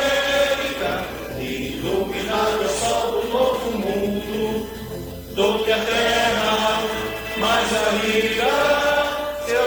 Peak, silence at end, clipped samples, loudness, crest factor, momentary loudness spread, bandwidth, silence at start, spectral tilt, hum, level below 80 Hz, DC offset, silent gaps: -6 dBFS; 0 s; under 0.1%; -21 LUFS; 16 dB; 9 LU; 19.5 kHz; 0 s; -3 dB/octave; none; -42 dBFS; under 0.1%; none